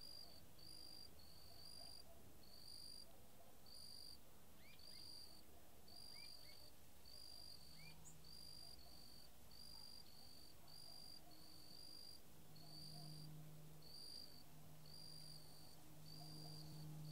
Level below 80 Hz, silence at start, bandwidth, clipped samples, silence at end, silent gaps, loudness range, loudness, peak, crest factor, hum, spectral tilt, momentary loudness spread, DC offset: -76 dBFS; 0 s; 16 kHz; under 0.1%; 0 s; none; 2 LU; -60 LUFS; -44 dBFS; 16 dB; none; -3.5 dB/octave; 7 LU; 0.1%